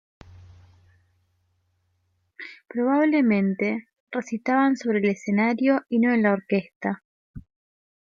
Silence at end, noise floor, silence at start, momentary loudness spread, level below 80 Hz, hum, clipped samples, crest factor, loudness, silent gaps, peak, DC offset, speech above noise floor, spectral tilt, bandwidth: 0.65 s; -71 dBFS; 2.4 s; 13 LU; -62 dBFS; none; under 0.1%; 16 dB; -23 LUFS; 4.00-4.07 s, 6.76-6.80 s, 7.05-7.34 s; -8 dBFS; under 0.1%; 49 dB; -7.5 dB/octave; 7.4 kHz